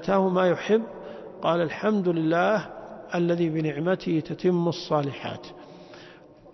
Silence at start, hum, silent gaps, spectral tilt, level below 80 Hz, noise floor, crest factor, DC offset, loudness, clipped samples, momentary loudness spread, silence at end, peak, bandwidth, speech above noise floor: 0 s; none; none; -7.5 dB/octave; -62 dBFS; -49 dBFS; 16 dB; under 0.1%; -25 LUFS; under 0.1%; 19 LU; 0.05 s; -10 dBFS; 6.2 kHz; 25 dB